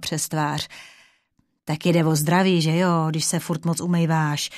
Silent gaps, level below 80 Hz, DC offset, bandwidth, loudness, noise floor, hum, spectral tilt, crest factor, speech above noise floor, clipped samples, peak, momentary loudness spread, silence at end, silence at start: none; -62 dBFS; under 0.1%; 14 kHz; -21 LUFS; -68 dBFS; none; -5 dB/octave; 18 dB; 47 dB; under 0.1%; -4 dBFS; 11 LU; 0 s; 0 s